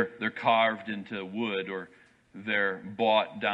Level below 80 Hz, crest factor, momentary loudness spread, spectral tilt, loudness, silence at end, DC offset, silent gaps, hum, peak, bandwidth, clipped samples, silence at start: -76 dBFS; 18 dB; 13 LU; -6.5 dB/octave; -28 LUFS; 0 s; under 0.1%; none; none; -12 dBFS; 7.6 kHz; under 0.1%; 0 s